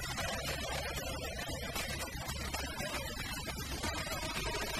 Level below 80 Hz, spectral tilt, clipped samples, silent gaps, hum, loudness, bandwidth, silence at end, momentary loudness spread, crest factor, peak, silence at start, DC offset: -46 dBFS; -3 dB/octave; under 0.1%; none; none; -38 LUFS; 15.5 kHz; 0 s; 3 LU; 14 dB; -24 dBFS; 0 s; under 0.1%